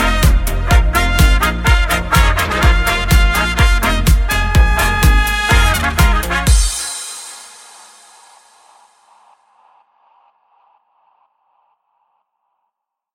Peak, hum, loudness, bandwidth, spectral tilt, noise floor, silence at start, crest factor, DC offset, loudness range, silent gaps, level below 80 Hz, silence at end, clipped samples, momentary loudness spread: 0 dBFS; none; -14 LUFS; 17 kHz; -4 dB/octave; -76 dBFS; 0 s; 14 dB; under 0.1%; 8 LU; none; -16 dBFS; 5.7 s; under 0.1%; 7 LU